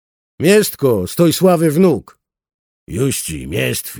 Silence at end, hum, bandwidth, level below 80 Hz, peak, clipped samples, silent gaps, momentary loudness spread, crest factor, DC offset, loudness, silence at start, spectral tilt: 0 s; none; over 20 kHz; -44 dBFS; -2 dBFS; under 0.1%; 2.54-2.87 s; 9 LU; 14 dB; under 0.1%; -15 LUFS; 0.4 s; -5.5 dB/octave